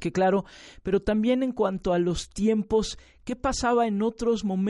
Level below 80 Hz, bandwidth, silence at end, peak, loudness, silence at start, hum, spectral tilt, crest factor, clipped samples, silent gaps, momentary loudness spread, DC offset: -44 dBFS; 11.5 kHz; 0 s; -10 dBFS; -26 LUFS; 0 s; none; -5.5 dB/octave; 16 dB; under 0.1%; none; 10 LU; under 0.1%